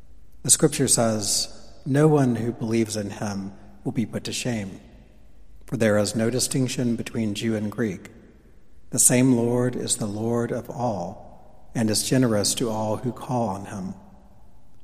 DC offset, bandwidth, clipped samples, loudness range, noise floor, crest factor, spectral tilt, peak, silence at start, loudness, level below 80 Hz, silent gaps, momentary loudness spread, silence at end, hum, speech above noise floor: under 0.1%; 15.5 kHz; under 0.1%; 5 LU; -50 dBFS; 24 dB; -4 dB/octave; 0 dBFS; 0 s; -23 LUFS; -52 dBFS; none; 15 LU; 0 s; none; 27 dB